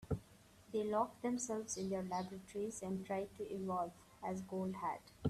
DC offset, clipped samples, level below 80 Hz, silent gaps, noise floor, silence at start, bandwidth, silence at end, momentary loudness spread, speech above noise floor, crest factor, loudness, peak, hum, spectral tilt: under 0.1%; under 0.1%; -66 dBFS; none; -64 dBFS; 0 s; 14 kHz; 0 s; 7 LU; 22 dB; 18 dB; -42 LUFS; -24 dBFS; none; -5.5 dB/octave